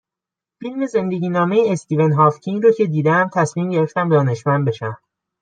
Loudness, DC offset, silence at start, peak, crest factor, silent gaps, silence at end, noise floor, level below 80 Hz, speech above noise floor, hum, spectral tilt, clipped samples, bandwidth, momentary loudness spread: -17 LUFS; under 0.1%; 0.6 s; -2 dBFS; 16 dB; none; 0.45 s; -87 dBFS; -66 dBFS; 70 dB; none; -7.5 dB/octave; under 0.1%; 9.2 kHz; 11 LU